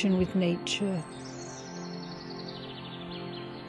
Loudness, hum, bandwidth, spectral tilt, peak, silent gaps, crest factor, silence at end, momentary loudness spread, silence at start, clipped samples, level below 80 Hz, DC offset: -34 LUFS; none; 11 kHz; -5.5 dB/octave; -16 dBFS; none; 16 dB; 0 s; 13 LU; 0 s; under 0.1%; -58 dBFS; under 0.1%